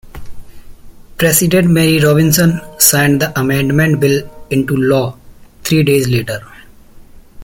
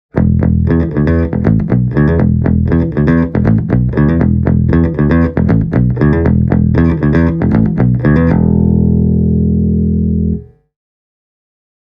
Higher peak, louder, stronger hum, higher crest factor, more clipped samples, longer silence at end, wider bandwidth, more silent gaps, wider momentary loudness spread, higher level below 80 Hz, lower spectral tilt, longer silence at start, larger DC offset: about the same, 0 dBFS vs 0 dBFS; about the same, -12 LUFS vs -12 LUFS; neither; about the same, 14 dB vs 10 dB; neither; second, 0 s vs 1.5 s; first, 17 kHz vs 5.4 kHz; neither; first, 9 LU vs 2 LU; second, -38 dBFS vs -22 dBFS; second, -4.5 dB/octave vs -11.5 dB/octave; about the same, 0.05 s vs 0.15 s; neither